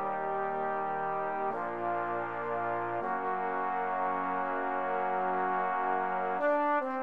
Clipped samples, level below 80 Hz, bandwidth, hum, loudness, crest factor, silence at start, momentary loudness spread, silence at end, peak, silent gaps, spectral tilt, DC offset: under 0.1%; -76 dBFS; 5.4 kHz; none; -32 LUFS; 12 dB; 0 s; 4 LU; 0 s; -20 dBFS; none; -7.5 dB/octave; 0.3%